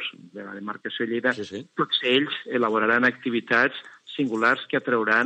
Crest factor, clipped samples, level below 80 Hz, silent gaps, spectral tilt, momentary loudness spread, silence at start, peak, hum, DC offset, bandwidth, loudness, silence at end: 18 dB; under 0.1%; -84 dBFS; none; -5 dB/octave; 14 LU; 0 s; -6 dBFS; none; under 0.1%; 8.6 kHz; -23 LUFS; 0 s